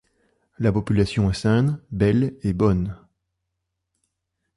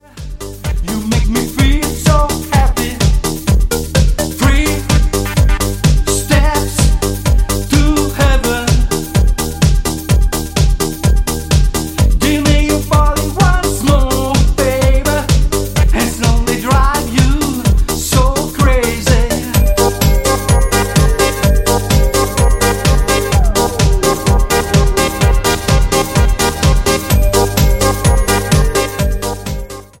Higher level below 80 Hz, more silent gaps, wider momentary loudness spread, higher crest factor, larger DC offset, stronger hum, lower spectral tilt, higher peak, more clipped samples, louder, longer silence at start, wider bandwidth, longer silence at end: second, -40 dBFS vs -14 dBFS; neither; about the same, 5 LU vs 3 LU; about the same, 16 dB vs 12 dB; neither; neither; first, -8 dB/octave vs -5 dB/octave; second, -6 dBFS vs 0 dBFS; neither; second, -22 LUFS vs -13 LUFS; first, 0.6 s vs 0.15 s; second, 11.5 kHz vs 17 kHz; first, 1.6 s vs 0.15 s